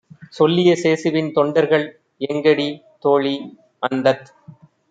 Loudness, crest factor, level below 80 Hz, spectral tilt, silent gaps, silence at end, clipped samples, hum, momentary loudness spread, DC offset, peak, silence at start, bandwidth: -18 LUFS; 16 dB; -66 dBFS; -6 dB/octave; none; 0.4 s; under 0.1%; none; 12 LU; under 0.1%; -2 dBFS; 0.2 s; 9 kHz